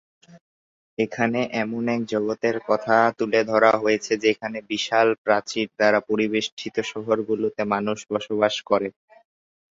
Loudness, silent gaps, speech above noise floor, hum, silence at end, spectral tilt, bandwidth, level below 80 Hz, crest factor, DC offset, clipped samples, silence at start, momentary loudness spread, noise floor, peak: -23 LUFS; 0.41-0.97 s, 5.18-5.25 s, 6.52-6.57 s; over 68 dB; none; 0.8 s; -4.5 dB/octave; 7.8 kHz; -66 dBFS; 20 dB; under 0.1%; under 0.1%; 0.35 s; 9 LU; under -90 dBFS; -4 dBFS